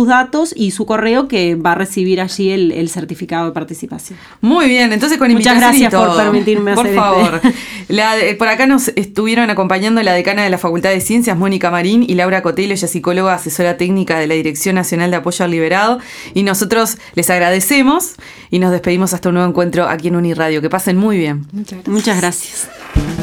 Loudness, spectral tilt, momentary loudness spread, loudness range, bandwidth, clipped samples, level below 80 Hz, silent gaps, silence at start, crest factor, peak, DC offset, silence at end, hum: -13 LUFS; -4.5 dB/octave; 9 LU; 4 LU; 18.5 kHz; under 0.1%; -38 dBFS; none; 0 s; 12 dB; 0 dBFS; 0.2%; 0 s; none